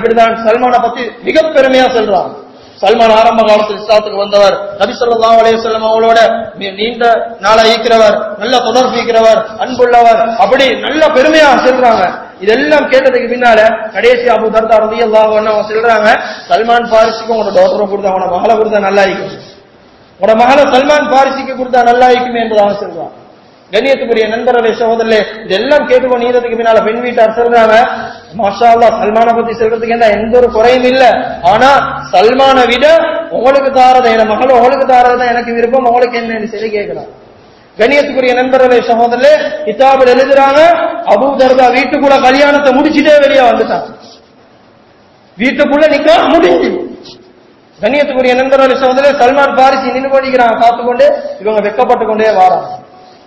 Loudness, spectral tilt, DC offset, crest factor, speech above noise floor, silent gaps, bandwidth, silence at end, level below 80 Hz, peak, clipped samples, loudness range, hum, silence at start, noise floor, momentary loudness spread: -8 LUFS; -4.5 dB/octave; under 0.1%; 8 dB; 35 dB; none; 8 kHz; 0.45 s; -42 dBFS; 0 dBFS; 4%; 4 LU; none; 0 s; -42 dBFS; 8 LU